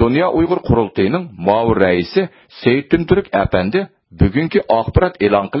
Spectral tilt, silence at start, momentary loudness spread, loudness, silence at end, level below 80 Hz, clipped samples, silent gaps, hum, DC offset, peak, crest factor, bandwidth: -10.5 dB/octave; 0 s; 5 LU; -16 LUFS; 0 s; -30 dBFS; under 0.1%; none; none; under 0.1%; 0 dBFS; 16 dB; 5.8 kHz